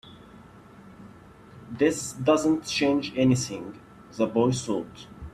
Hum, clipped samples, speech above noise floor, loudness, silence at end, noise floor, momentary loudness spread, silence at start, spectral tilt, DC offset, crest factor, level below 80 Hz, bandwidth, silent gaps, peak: none; under 0.1%; 24 dB; -25 LUFS; 0.05 s; -49 dBFS; 19 LU; 0.05 s; -5 dB/octave; under 0.1%; 18 dB; -56 dBFS; 14 kHz; none; -8 dBFS